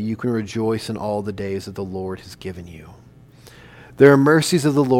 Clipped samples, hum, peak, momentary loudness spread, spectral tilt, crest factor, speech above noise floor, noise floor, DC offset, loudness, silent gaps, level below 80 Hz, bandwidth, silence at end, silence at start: under 0.1%; none; 0 dBFS; 20 LU; -6 dB/octave; 20 dB; 27 dB; -46 dBFS; under 0.1%; -19 LUFS; none; -52 dBFS; 16 kHz; 0 s; 0 s